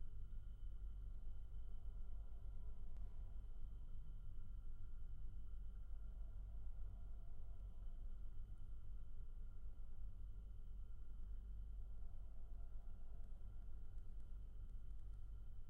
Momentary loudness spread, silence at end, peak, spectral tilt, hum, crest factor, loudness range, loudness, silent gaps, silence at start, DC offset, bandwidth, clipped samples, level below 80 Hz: 3 LU; 0 s; -38 dBFS; -10 dB/octave; none; 10 dB; 2 LU; -58 LUFS; none; 0 s; under 0.1%; 3.2 kHz; under 0.1%; -50 dBFS